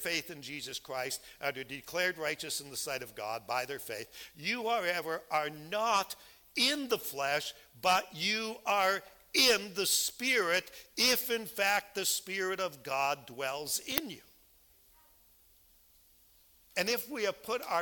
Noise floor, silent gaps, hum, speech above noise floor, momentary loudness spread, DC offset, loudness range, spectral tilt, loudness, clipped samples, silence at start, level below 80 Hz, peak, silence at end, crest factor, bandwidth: -64 dBFS; none; none; 30 dB; 11 LU; under 0.1%; 10 LU; -1 dB/octave; -32 LUFS; under 0.1%; 0 s; -70 dBFS; -4 dBFS; 0 s; 30 dB; 18 kHz